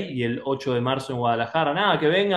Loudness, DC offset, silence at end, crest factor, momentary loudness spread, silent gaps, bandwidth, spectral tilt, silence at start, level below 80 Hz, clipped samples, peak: -23 LUFS; under 0.1%; 0 s; 16 dB; 6 LU; none; 12 kHz; -6 dB/octave; 0 s; -62 dBFS; under 0.1%; -6 dBFS